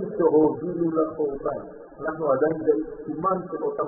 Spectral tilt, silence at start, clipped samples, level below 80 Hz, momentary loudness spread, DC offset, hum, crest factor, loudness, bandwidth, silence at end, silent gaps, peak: -4.5 dB/octave; 0 s; under 0.1%; -56 dBFS; 12 LU; under 0.1%; none; 16 dB; -25 LUFS; 2.2 kHz; 0 s; none; -8 dBFS